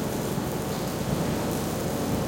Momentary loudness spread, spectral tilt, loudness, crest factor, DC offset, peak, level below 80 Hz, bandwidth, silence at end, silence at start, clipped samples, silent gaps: 2 LU; -5.5 dB/octave; -28 LUFS; 14 dB; under 0.1%; -14 dBFS; -44 dBFS; 17 kHz; 0 s; 0 s; under 0.1%; none